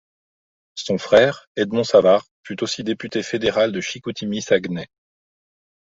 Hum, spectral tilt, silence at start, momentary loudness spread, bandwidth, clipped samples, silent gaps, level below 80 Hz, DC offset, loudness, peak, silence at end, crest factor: none; -4.5 dB/octave; 0.75 s; 15 LU; 8 kHz; under 0.1%; 1.47-1.55 s, 2.31-2.44 s; -58 dBFS; under 0.1%; -20 LUFS; -2 dBFS; 1.1 s; 20 dB